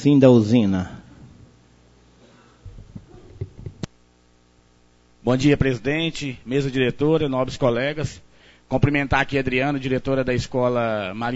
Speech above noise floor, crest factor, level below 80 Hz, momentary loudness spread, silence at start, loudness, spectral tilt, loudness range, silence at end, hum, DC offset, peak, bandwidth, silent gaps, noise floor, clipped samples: 37 dB; 20 dB; -42 dBFS; 18 LU; 0 s; -21 LUFS; -7 dB/octave; 20 LU; 0 s; 60 Hz at -55 dBFS; under 0.1%; -2 dBFS; 8 kHz; none; -57 dBFS; under 0.1%